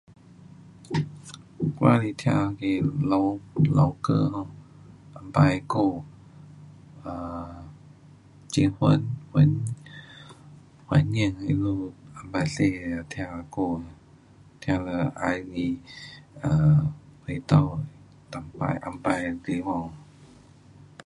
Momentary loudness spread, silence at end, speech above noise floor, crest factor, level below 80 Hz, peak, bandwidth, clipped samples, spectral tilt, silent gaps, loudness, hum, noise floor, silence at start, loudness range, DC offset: 20 LU; 0.8 s; 29 dB; 22 dB; -50 dBFS; -4 dBFS; 11 kHz; under 0.1%; -7.5 dB/octave; none; -26 LUFS; none; -53 dBFS; 0.8 s; 6 LU; under 0.1%